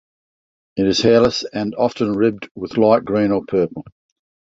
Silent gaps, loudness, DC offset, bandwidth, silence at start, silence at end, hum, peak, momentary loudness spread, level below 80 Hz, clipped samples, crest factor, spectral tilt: 2.51-2.55 s; -18 LUFS; under 0.1%; 7.8 kHz; 0.75 s; 0.55 s; none; -2 dBFS; 11 LU; -50 dBFS; under 0.1%; 16 dB; -5.5 dB/octave